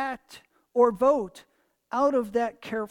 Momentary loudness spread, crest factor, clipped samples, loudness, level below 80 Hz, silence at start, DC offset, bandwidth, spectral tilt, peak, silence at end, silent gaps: 12 LU; 18 dB; under 0.1%; -25 LUFS; -62 dBFS; 0 s; under 0.1%; 14 kHz; -6 dB/octave; -8 dBFS; 0.05 s; none